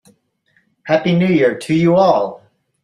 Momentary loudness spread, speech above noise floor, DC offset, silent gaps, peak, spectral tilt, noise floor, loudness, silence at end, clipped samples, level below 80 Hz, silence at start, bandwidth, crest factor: 8 LU; 47 dB; under 0.1%; none; -2 dBFS; -7.5 dB/octave; -61 dBFS; -15 LUFS; 0.5 s; under 0.1%; -56 dBFS; 0.85 s; 11 kHz; 14 dB